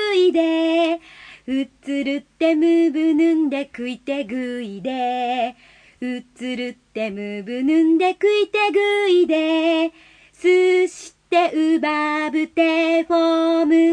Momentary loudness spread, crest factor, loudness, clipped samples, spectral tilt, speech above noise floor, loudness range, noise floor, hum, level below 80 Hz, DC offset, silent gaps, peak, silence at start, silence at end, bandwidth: 12 LU; 14 dB; -19 LUFS; under 0.1%; -4.5 dB/octave; 25 dB; 8 LU; -44 dBFS; none; -64 dBFS; under 0.1%; none; -6 dBFS; 0 s; 0 s; 10 kHz